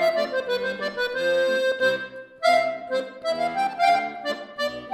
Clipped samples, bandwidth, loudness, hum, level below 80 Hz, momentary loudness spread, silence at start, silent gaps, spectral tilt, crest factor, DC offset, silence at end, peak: under 0.1%; 16 kHz; -24 LUFS; none; -66 dBFS; 8 LU; 0 s; none; -3 dB/octave; 16 dB; under 0.1%; 0 s; -8 dBFS